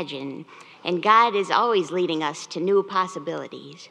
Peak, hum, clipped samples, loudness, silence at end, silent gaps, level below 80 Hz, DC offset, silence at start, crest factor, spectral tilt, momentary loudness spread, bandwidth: -2 dBFS; none; under 0.1%; -22 LUFS; 0.05 s; none; -86 dBFS; under 0.1%; 0 s; 20 dB; -4.5 dB/octave; 18 LU; 10 kHz